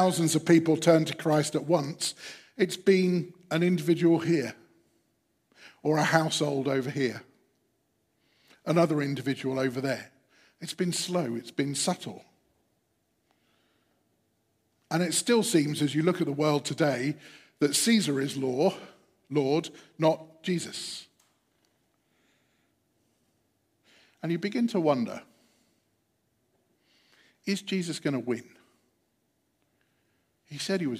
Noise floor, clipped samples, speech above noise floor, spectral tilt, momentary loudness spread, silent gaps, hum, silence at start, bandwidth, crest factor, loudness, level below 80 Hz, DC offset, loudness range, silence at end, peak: -75 dBFS; under 0.1%; 48 dB; -5 dB/octave; 13 LU; none; none; 0 s; 15.5 kHz; 24 dB; -27 LUFS; -78 dBFS; under 0.1%; 9 LU; 0 s; -6 dBFS